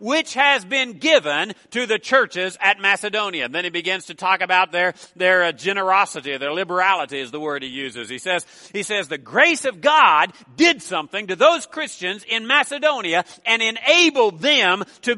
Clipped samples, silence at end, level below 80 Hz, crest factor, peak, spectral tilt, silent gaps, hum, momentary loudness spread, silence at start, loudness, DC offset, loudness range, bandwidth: under 0.1%; 0 s; -72 dBFS; 20 dB; 0 dBFS; -2 dB/octave; none; none; 11 LU; 0 s; -18 LUFS; under 0.1%; 4 LU; 11.5 kHz